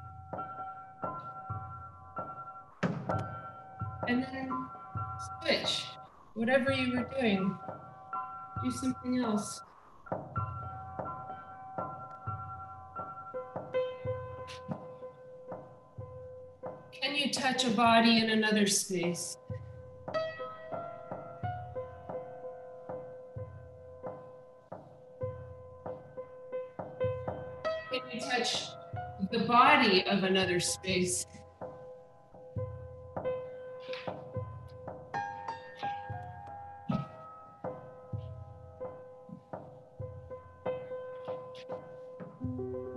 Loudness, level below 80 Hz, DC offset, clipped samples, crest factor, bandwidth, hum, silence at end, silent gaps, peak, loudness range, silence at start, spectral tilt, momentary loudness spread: -34 LUFS; -66 dBFS; under 0.1%; under 0.1%; 26 dB; 13 kHz; none; 0 s; none; -10 dBFS; 16 LU; 0 s; -4 dB/octave; 19 LU